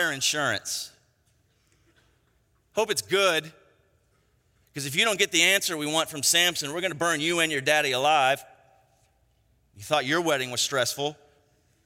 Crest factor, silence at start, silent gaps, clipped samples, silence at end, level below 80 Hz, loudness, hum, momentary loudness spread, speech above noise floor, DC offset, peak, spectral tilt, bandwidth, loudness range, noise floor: 24 dB; 0 s; none; under 0.1%; 0.7 s; -70 dBFS; -24 LUFS; none; 12 LU; 42 dB; under 0.1%; -4 dBFS; -1.5 dB/octave; 16.5 kHz; 7 LU; -67 dBFS